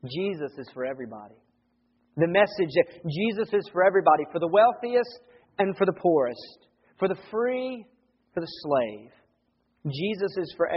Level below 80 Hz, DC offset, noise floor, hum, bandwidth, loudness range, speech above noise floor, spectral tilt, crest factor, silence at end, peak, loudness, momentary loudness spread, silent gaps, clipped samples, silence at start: -70 dBFS; under 0.1%; -71 dBFS; none; 5.8 kHz; 8 LU; 46 dB; -4.5 dB/octave; 20 dB; 0 s; -6 dBFS; -26 LUFS; 16 LU; none; under 0.1%; 0.05 s